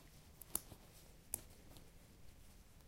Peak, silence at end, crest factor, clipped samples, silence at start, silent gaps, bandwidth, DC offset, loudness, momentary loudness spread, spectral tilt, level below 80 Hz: -16 dBFS; 0 s; 38 dB; under 0.1%; 0 s; none; 16 kHz; under 0.1%; -49 LUFS; 18 LU; -2.5 dB/octave; -64 dBFS